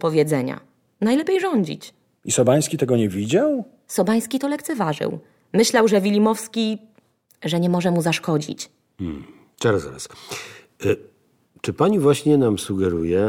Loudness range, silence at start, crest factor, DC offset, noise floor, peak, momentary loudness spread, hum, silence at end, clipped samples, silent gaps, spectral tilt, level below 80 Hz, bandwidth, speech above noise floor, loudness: 5 LU; 0 s; 18 dB; under 0.1%; -59 dBFS; -4 dBFS; 16 LU; none; 0 s; under 0.1%; none; -5.5 dB/octave; -56 dBFS; 17.5 kHz; 39 dB; -21 LUFS